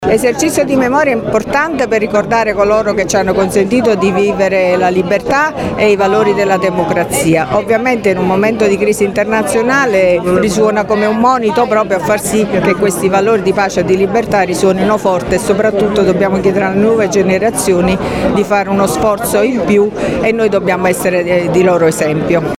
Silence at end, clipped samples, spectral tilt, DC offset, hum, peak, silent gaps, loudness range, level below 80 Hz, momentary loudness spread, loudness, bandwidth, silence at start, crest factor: 0.05 s; under 0.1%; -5 dB/octave; under 0.1%; none; 0 dBFS; none; 1 LU; -38 dBFS; 2 LU; -12 LUFS; 16.5 kHz; 0 s; 12 dB